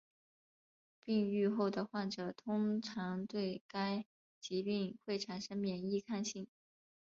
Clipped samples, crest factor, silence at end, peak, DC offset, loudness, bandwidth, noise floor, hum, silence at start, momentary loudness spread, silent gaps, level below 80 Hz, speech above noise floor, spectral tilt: under 0.1%; 16 dB; 0.6 s; -24 dBFS; under 0.1%; -39 LUFS; 7.6 kHz; under -90 dBFS; none; 1.05 s; 8 LU; 3.61-3.69 s, 4.06-4.42 s; -80 dBFS; over 52 dB; -5.5 dB/octave